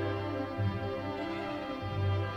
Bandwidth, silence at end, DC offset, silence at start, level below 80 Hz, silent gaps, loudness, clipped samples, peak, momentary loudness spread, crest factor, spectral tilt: 6.4 kHz; 0 s; under 0.1%; 0 s; -56 dBFS; none; -35 LUFS; under 0.1%; -20 dBFS; 4 LU; 14 dB; -8 dB/octave